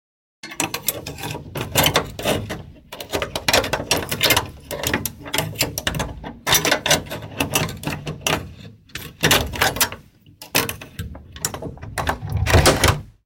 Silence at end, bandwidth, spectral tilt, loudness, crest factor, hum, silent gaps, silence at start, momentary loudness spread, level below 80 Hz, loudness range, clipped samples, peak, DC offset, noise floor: 0.15 s; 17 kHz; -3 dB/octave; -20 LUFS; 22 dB; none; none; 0.45 s; 17 LU; -36 dBFS; 2 LU; under 0.1%; -2 dBFS; under 0.1%; -45 dBFS